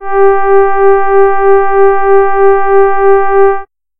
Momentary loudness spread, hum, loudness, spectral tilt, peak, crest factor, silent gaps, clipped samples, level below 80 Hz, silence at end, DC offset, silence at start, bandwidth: 2 LU; none; -8 LUFS; -10 dB/octave; 0 dBFS; 6 dB; none; under 0.1%; -36 dBFS; 0.35 s; under 0.1%; 0 s; 3.3 kHz